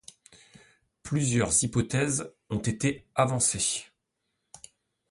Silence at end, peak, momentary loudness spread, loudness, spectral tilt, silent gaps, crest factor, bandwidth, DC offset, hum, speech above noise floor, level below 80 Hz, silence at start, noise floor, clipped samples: 1.25 s; -8 dBFS; 9 LU; -27 LUFS; -4 dB/octave; none; 22 dB; 11.5 kHz; under 0.1%; none; 53 dB; -54 dBFS; 1.05 s; -80 dBFS; under 0.1%